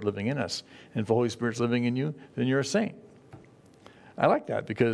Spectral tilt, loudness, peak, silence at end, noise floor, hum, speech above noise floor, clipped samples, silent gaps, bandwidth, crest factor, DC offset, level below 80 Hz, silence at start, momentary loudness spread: -6 dB/octave; -29 LUFS; -6 dBFS; 0 s; -54 dBFS; none; 27 dB; under 0.1%; none; 11 kHz; 22 dB; under 0.1%; -68 dBFS; 0 s; 9 LU